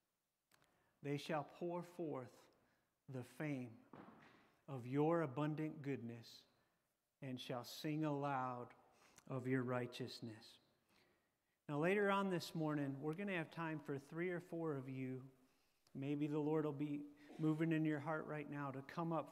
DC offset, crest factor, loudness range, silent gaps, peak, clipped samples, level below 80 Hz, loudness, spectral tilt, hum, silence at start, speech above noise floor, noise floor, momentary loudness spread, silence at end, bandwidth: under 0.1%; 20 dB; 6 LU; none; -26 dBFS; under 0.1%; under -90 dBFS; -44 LUFS; -7 dB/octave; none; 1.05 s; over 46 dB; under -90 dBFS; 17 LU; 0 s; 15 kHz